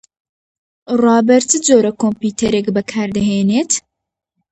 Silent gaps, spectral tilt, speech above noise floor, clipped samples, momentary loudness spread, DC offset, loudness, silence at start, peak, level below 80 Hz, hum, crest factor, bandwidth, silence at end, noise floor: none; -4.5 dB/octave; 64 dB; under 0.1%; 8 LU; under 0.1%; -14 LUFS; 0.9 s; 0 dBFS; -50 dBFS; none; 16 dB; 9 kHz; 0.7 s; -78 dBFS